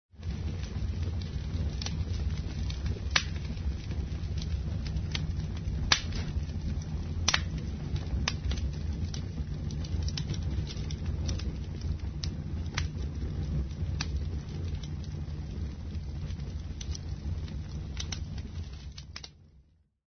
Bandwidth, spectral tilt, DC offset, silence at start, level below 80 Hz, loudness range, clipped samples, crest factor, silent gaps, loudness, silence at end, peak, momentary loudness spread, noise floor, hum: 6.4 kHz; -4.5 dB/octave; under 0.1%; 0.15 s; -38 dBFS; 7 LU; under 0.1%; 30 dB; none; -35 LUFS; 0.55 s; -4 dBFS; 9 LU; -62 dBFS; none